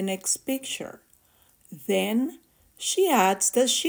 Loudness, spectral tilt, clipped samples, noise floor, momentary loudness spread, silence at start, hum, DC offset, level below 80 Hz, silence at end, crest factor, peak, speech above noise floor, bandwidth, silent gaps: -24 LUFS; -2.5 dB/octave; under 0.1%; -61 dBFS; 13 LU; 0 s; none; under 0.1%; -72 dBFS; 0 s; 18 dB; -8 dBFS; 36 dB; 16 kHz; none